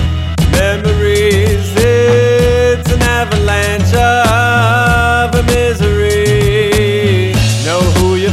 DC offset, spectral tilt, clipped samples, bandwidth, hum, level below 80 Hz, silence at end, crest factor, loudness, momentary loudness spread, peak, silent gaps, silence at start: under 0.1%; -5.5 dB/octave; under 0.1%; 15 kHz; none; -20 dBFS; 0 s; 10 dB; -11 LUFS; 3 LU; 0 dBFS; none; 0 s